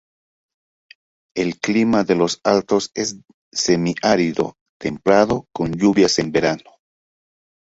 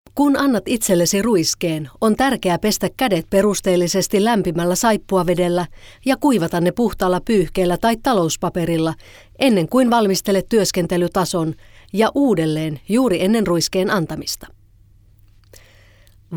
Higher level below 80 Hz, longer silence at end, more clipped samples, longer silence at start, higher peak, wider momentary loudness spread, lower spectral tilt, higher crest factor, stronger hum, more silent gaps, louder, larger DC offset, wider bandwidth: second, -52 dBFS vs -42 dBFS; first, 1.15 s vs 0 s; neither; first, 1.35 s vs 0.15 s; about the same, -2 dBFS vs -2 dBFS; first, 11 LU vs 7 LU; about the same, -4.5 dB/octave vs -5 dB/octave; about the same, 18 dB vs 16 dB; neither; first, 3.34-3.52 s, 4.61-4.80 s vs none; about the same, -19 LUFS vs -18 LUFS; neither; second, 8 kHz vs 19.5 kHz